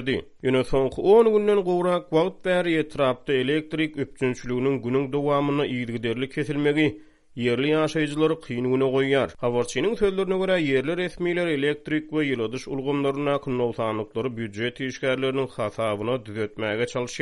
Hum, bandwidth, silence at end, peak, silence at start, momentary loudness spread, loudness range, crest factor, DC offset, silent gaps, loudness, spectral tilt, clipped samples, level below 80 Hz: none; 11.5 kHz; 0 s; -6 dBFS; 0 s; 7 LU; 5 LU; 18 dB; under 0.1%; none; -24 LUFS; -6 dB/octave; under 0.1%; -50 dBFS